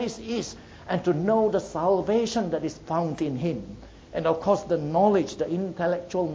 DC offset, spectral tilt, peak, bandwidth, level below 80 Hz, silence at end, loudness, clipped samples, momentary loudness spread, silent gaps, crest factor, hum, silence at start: under 0.1%; -6.5 dB/octave; -8 dBFS; 8 kHz; -54 dBFS; 0 s; -26 LUFS; under 0.1%; 10 LU; none; 18 dB; none; 0 s